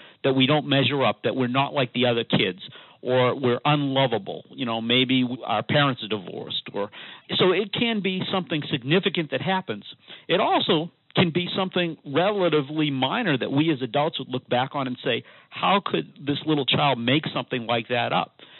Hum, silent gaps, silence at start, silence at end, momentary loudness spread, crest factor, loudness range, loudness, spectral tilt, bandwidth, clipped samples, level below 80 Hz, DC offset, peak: none; none; 0 s; 0 s; 9 LU; 20 dB; 2 LU; -23 LUFS; -3.5 dB/octave; 4.3 kHz; under 0.1%; -76 dBFS; under 0.1%; -4 dBFS